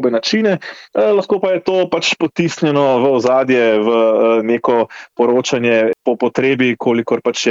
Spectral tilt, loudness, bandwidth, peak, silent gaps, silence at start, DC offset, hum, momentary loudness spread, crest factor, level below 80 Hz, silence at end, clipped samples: -5 dB/octave; -15 LUFS; 7.8 kHz; -2 dBFS; none; 0 s; under 0.1%; none; 5 LU; 12 dB; -62 dBFS; 0 s; under 0.1%